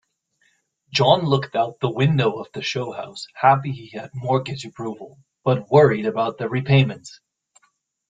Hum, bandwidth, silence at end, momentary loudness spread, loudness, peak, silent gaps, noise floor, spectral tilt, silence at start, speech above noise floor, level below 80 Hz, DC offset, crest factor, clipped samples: none; 7.8 kHz; 1 s; 15 LU; -20 LUFS; 0 dBFS; none; -66 dBFS; -6.5 dB/octave; 0.9 s; 46 dB; -58 dBFS; under 0.1%; 20 dB; under 0.1%